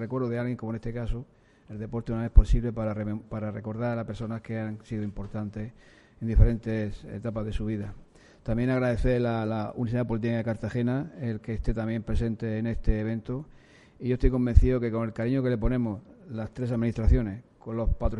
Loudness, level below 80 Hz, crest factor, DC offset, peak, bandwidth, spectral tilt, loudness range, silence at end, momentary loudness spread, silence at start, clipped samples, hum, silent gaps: -29 LUFS; -30 dBFS; 24 dB; under 0.1%; -2 dBFS; 7.8 kHz; -9 dB/octave; 4 LU; 0 s; 12 LU; 0 s; under 0.1%; none; none